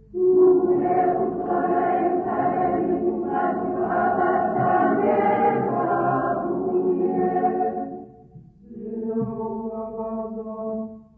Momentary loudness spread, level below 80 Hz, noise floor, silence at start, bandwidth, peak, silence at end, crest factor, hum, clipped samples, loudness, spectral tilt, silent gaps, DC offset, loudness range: 11 LU; -56 dBFS; -47 dBFS; 0.1 s; 3.2 kHz; -8 dBFS; 0.15 s; 14 dB; none; under 0.1%; -22 LUFS; -11.5 dB/octave; none; under 0.1%; 7 LU